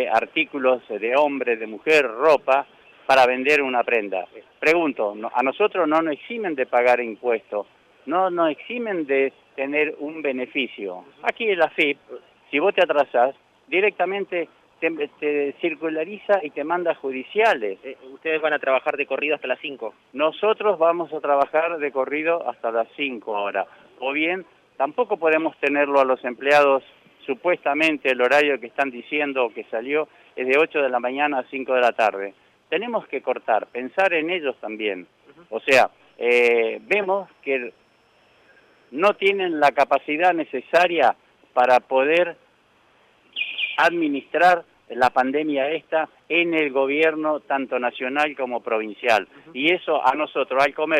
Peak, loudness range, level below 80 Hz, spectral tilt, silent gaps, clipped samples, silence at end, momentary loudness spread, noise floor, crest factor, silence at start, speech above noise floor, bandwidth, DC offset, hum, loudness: -6 dBFS; 4 LU; -70 dBFS; -4.5 dB/octave; none; under 0.1%; 0 s; 10 LU; -59 dBFS; 16 dB; 0 s; 38 dB; 15 kHz; under 0.1%; none; -21 LUFS